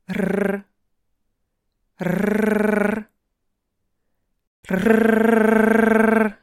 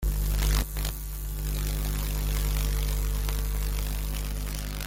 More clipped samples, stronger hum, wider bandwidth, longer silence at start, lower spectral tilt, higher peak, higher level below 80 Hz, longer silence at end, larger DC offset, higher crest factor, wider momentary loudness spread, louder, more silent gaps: neither; second, none vs 50 Hz at -30 dBFS; second, 13.5 kHz vs 17 kHz; about the same, 0.1 s vs 0 s; first, -7 dB/octave vs -4 dB/octave; first, -2 dBFS vs -8 dBFS; second, -52 dBFS vs -28 dBFS; about the same, 0.1 s vs 0 s; neither; about the same, 18 dB vs 20 dB; first, 10 LU vs 6 LU; first, -18 LUFS vs -31 LUFS; first, 4.47-4.63 s vs none